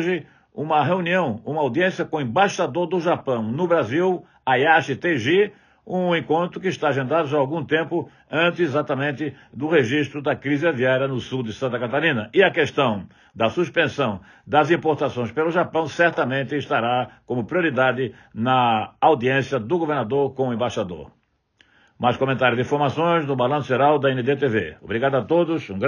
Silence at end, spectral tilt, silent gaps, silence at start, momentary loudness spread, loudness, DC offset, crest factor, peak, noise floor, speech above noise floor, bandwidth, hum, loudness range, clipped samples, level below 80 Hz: 0 s; -6.5 dB/octave; none; 0 s; 8 LU; -21 LUFS; under 0.1%; 18 dB; -4 dBFS; -61 dBFS; 40 dB; 10 kHz; none; 2 LU; under 0.1%; -62 dBFS